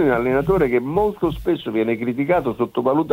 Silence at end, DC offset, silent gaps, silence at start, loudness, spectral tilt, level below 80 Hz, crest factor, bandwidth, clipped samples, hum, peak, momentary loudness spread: 0 s; under 0.1%; none; 0 s; -20 LUFS; -8.5 dB/octave; -40 dBFS; 14 dB; 16 kHz; under 0.1%; none; -4 dBFS; 5 LU